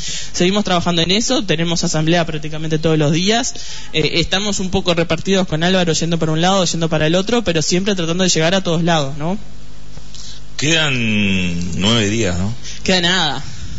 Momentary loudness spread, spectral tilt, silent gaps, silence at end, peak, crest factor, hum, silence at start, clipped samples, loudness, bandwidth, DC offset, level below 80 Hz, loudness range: 9 LU; -4 dB/octave; none; 0 s; -2 dBFS; 14 dB; none; 0 s; under 0.1%; -16 LUFS; 8 kHz; 7%; -38 dBFS; 2 LU